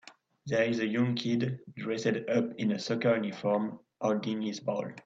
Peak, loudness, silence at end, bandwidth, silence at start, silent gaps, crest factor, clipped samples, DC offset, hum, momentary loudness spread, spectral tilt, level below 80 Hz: -14 dBFS; -31 LUFS; 0.05 s; 7.8 kHz; 0.05 s; none; 16 dB; under 0.1%; under 0.1%; none; 7 LU; -6 dB/octave; -74 dBFS